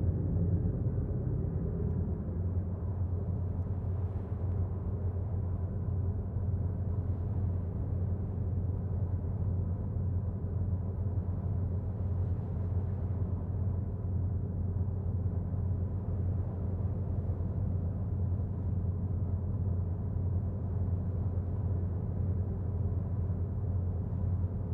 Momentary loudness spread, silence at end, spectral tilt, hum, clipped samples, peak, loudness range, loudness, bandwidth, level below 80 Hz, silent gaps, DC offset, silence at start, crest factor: 2 LU; 0 s; -13 dB/octave; none; under 0.1%; -20 dBFS; 1 LU; -34 LUFS; 2 kHz; -42 dBFS; none; under 0.1%; 0 s; 12 dB